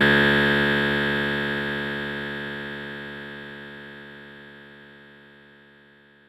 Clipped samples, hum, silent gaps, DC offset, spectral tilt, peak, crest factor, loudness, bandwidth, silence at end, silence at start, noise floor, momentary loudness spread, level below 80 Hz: under 0.1%; none; none; under 0.1%; -6 dB/octave; -8 dBFS; 18 dB; -23 LUFS; 15.5 kHz; 1.15 s; 0 s; -54 dBFS; 24 LU; -50 dBFS